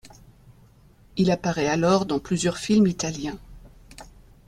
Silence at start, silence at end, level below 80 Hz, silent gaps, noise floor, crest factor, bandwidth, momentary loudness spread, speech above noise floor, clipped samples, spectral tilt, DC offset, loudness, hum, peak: 0.05 s; 0.45 s; -50 dBFS; none; -54 dBFS; 18 dB; 13 kHz; 13 LU; 31 dB; under 0.1%; -5.5 dB/octave; under 0.1%; -23 LUFS; none; -8 dBFS